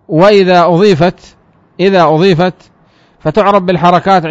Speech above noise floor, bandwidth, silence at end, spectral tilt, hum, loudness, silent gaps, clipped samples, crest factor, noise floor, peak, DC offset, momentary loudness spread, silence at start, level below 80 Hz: 40 dB; 7.8 kHz; 0 s; -7 dB/octave; none; -9 LUFS; none; 0.8%; 10 dB; -48 dBFS; 0 dBFS; under 0.1%; 7 LU; 0.1 s; -42 dBFS